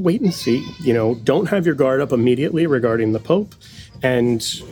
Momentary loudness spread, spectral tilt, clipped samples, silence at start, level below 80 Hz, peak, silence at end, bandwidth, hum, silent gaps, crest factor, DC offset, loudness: 4 LU; -6 dB/octave; under 0.1%; 0 s; -52 dBFS; -2 dBFS; 0 s; 19.5 kHz; none; none; 16 dB; under 0.1%; -18 LUFS